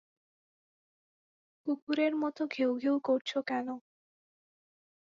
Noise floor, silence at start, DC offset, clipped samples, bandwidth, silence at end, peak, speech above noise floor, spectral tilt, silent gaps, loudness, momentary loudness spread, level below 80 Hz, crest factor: under -90 dBFS; 1.65 s; under 0.1%; under 0.1%; 7.4 kHz; 1.3 s; -18 dBFS; over 58 dB; -4.5 dB/octave; 1.82-1.87 s, 3.21-3.25 s; -32 LUFS; 10 LU; -82 dBFS; 18 dB